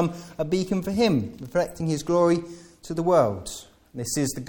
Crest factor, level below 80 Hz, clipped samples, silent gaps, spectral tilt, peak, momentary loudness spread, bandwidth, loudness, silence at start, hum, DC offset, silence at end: 18 dB; -52 dBFS; under 0.1%; none; -5.5 dB/octave; -8 dBFS; 16 LU; 18 kHz; -25 LUFS; 0 s; none; under 0.1%; 0 s